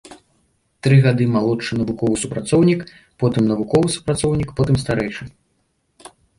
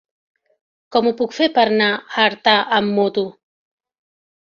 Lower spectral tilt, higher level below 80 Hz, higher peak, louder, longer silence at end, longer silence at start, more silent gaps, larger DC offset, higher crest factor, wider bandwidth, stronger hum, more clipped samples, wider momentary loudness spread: first, -6.5 dB/octave vs -5 dB/octave; first, -44 dBFS vs -64 dBFS; about the same, -2 dBFS vs -2 dBFS; about the same, -18 LUFS vs -17 LUFS; about the same, 1.1 s vs 1.1 s; second, 0.1 s vs 0.9 s; neither; neither; about the same, 16 dB vs 18 dB; first, 11.5 kHz vs 7.2 kHz; neither; neither; first, 9 LU vs 6 LU